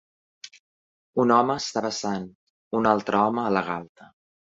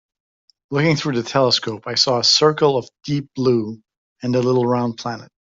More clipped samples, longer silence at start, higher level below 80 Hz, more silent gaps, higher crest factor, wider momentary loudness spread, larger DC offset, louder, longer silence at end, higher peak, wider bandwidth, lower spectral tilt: neither; second, 0.45 s vs 0.7 s; about the same, -64 dBFS vs -60 dBFS; first, 0.60-1.13 s, 2.35-2.71 s, 3.89-3.95 s vs 3.97-4.16 s; about the same, 22 dB vs 18 dB; first, 24 LU vs 12 LU; neither; second, -24 LUFS vs -18 LUFS; first, 0.5 s vs 0.15 s; about the same, -4 dBFS vs -2 dBFS; about the same, 8 kHz vs 7.8 kHz; about the same, -5 dB/octave vs -4.5 dB/octave